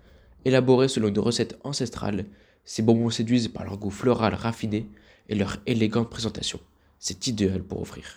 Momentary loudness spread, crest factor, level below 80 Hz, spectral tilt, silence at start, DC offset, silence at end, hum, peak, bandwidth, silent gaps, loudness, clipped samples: 12 LU; 20 dB; -52 dBFS; -5.5 dB/octave; 0.45 s; under 0.1%; 0.05 s; none; -6 dBFS; 14 kHz; none; -26 LUFS; under 0.1%